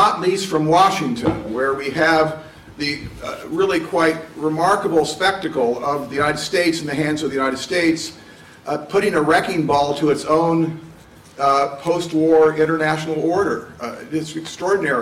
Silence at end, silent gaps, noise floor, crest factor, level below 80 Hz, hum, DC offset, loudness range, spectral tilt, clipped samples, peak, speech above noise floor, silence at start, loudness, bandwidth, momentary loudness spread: 0 s; none; -43 dBFS; 14 dB; -52 dBFS; none; under 0.1%; 2 LU; -5 dB/octave; under 0.1%; -4 dBFS; 25 dB; 0 s; -19 LUFS; 15 kHz; 10 LU